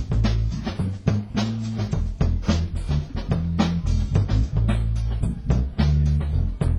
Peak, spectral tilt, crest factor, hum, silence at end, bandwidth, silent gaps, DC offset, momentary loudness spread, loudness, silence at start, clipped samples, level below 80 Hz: -6 dBFS; -7.5 dB/octave; 16 dB; none; 0 s; 11 kHz; none; under 0.1%; 5 LU; -24 LUFS; 0 s; under 0.1%; -26 dBFS